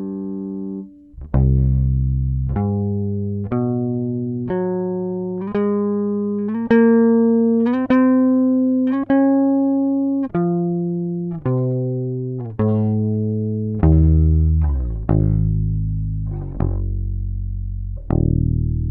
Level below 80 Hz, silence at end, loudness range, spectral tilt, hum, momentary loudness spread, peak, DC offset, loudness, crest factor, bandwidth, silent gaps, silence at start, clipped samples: -26 dBFS; 0 s; 6 LU; -12.5 dB/octave; none; 11 LU; -2 dBFS; under 0.1%; -19 LUFS; 14 dB; 4 kHz; none; 0 s; under 0.1%